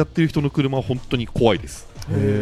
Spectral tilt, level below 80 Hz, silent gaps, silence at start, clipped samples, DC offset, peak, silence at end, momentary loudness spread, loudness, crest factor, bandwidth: -7 dB/octave; -38 dBFS; none; 0 s; under 0.1%; under 0.1%; -2 dBFS; 0 s; 7 LU; -21 LUFS; 18 dB; 13.5 kHz